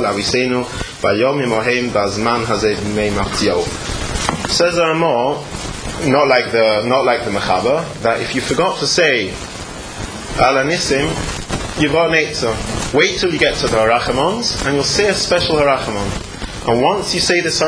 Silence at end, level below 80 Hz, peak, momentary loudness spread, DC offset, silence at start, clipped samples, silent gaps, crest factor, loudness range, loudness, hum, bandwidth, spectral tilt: 0 s; -34 dBFS; 0 dBFS; 10 LU; under 0.1%; 0 s; under 0.1%; none; 16 dB; 2 LU; -16 LUFS; none; 10.5 kHz; -3.5 dB/octave